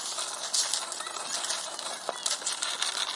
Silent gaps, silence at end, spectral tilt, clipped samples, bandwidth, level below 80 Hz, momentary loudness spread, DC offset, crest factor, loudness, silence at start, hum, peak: none; 0 s; 2.5 dB/octave; under 0.1%; 11.5 kHz; -84 dBFS; 7 LU; under 0.1%; 24 dB; -30 LUFS; 0 s; none; -8 dBFS